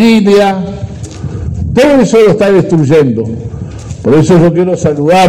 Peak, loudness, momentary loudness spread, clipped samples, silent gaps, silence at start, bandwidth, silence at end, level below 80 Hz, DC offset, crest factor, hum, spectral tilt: 0 dBFS; -8 LUFS; 16 LU; 0.3%; none; 0 s; 15.5 kHz; 0 s; -32 dBFS; under 0.1%; 8 dB; none; -7 dB/octave